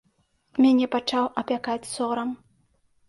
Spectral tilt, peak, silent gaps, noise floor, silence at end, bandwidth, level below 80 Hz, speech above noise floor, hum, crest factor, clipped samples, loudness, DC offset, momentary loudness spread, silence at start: -4 dB/octave; -8 dBFS; none; -68 dBFS; 0.75 s; 11.5 kHz; -66 dBFS; 45 dB; none; 16 dB; under 0.1%; -25 LUFS; under 0.1%; 13 LU; 0.55 s